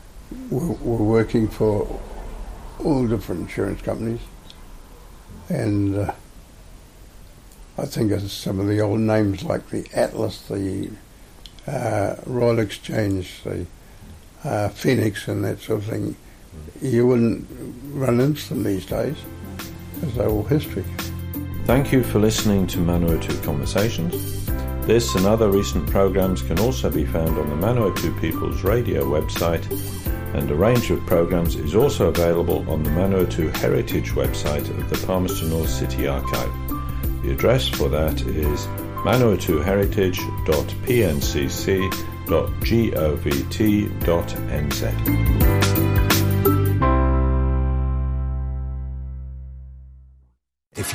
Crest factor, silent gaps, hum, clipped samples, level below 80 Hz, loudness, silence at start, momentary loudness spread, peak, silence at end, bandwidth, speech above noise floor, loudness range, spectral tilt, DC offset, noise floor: 18 dB; none; none; under 0.1%; -30 dBFS; -22 LUFS; 0.05 s; 12 LU; -4 dBFS; 0 s; 15.5 kHz; 42 dB; 6 LU; -6 dB/octave; under 0.1%; -63 dBFS